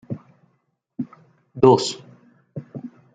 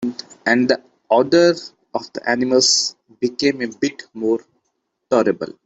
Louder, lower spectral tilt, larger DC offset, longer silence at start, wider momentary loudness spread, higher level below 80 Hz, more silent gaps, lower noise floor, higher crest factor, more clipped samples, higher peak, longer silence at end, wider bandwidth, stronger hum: about the same, -17 LUFS vs -18 LUFS; first, -6 dB/octave vs -3 dB/octave; neither; about the same, 0.1 s vs 0 s; first, 24 LU vs 12 LU; about the same, -64 dBFS vs -62 dBFS; neither; second, -69 dBFS vs -73 dBFS; first, 22 dB vs 16 dB; neither; about the same, -2 dBFS vs -2 dBFS; about the same, 0.25 s vs 0.2 s; about the same, 9.2 kHz vs 8.4 kHz; neither